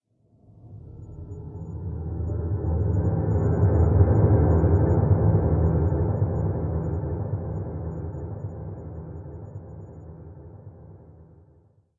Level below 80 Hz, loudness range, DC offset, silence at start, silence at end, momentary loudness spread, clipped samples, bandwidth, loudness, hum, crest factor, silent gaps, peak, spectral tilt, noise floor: -36 dBFS; 17 LU; under 0.1%; 0.65 s; 0.75 s; 23 LU; under 0.1%; 2.2 kHz; -24 LUFS; none; 18 dB; none; -6 dBFS; -13.5 dB/octave; -59 dBFS